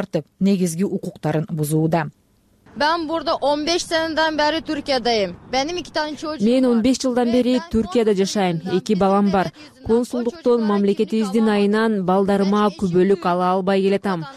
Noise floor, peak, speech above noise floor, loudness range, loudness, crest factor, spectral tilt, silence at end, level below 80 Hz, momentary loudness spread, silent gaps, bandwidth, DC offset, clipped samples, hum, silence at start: -56 dBFS; -8 dBFS; 37 dB; 3 LU; -19 LUFS; 12 dB; -5.5 dB/octave; 0 s; -48 dBFS; 6 LU; none; 14 kHz; under 0.1%; under 0.1%; none; 0 s